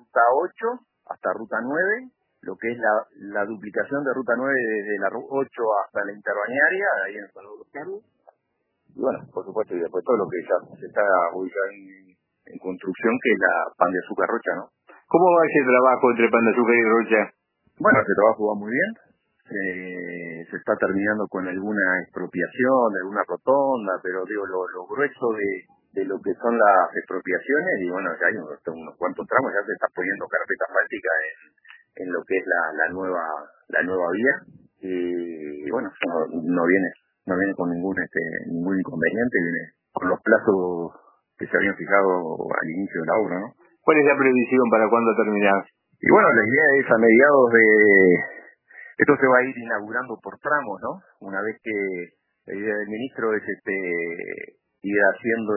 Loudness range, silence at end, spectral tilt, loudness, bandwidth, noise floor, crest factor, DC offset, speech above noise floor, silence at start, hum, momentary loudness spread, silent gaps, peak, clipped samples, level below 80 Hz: 9 LU; 0 s; -10.5 dB/octave; -22 LUFS; 3.1 kHz; -75 dBFS; 22 dB; under 0.1%; 53 dB; 0.15 s; none; 15 LU; none; -2 dBFS; under 0.1%; -70 dBFS